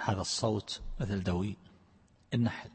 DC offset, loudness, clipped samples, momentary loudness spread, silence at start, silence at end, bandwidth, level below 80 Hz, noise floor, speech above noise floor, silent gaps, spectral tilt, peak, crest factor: under 0.1%; -34 LUFS; under 0.1%; 8 LU; 0 s; 0 s; 8.8 kHz; -50 dBFS; -64 dBFS; 31 dB; none; -5 dB/octave; -14 dBFS; 22 dB